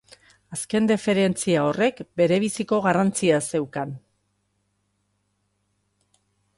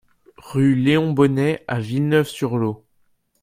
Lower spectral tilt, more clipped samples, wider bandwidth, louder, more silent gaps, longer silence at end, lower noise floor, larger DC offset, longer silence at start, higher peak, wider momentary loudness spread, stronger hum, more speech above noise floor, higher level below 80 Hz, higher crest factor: second, -5 dB/octave vs -7.5 dB/octave; neither; second, 11.5 kHz vs 15.5 kHz; about the same, -22 LUFS vs -20 LUFS; neither; first, 2.6 s vs 0.65 s; first, -72 dBFS vs -63 dBFS; neither; about the same, 0.5 s vs 0.45 s; second, -8 dBFS vs -2 dBFS; first, 12 LU vs 9 LU; first, 50 Hz at -55 dBFS vs none; first, 50 dB vs 44 dB; second, -64 dBFS vs -56 dBFS; about the same, 18 dB vs 18 dB